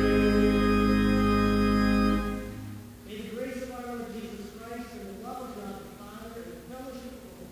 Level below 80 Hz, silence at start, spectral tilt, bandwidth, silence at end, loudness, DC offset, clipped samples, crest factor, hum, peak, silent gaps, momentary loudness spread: -38 dBFS; 0 s; -6.5 dB/octave; 16 kHz; 0 s; -26 LUFS; under 0.1%; under 0.1%; 18 dB; none; -12 dBFS; none; 19 LU